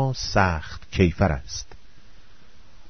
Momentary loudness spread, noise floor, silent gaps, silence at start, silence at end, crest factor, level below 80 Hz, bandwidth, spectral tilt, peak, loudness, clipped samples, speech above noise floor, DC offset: 14 LU; -52 dBFS; none; 0 s; 0.1 s; 22 dB; -38 dBFS; 6.6 kHz; -5.5 dB/octave; -4 dBFS; -24 LUFS; under 0.1%; 29 dB; 1%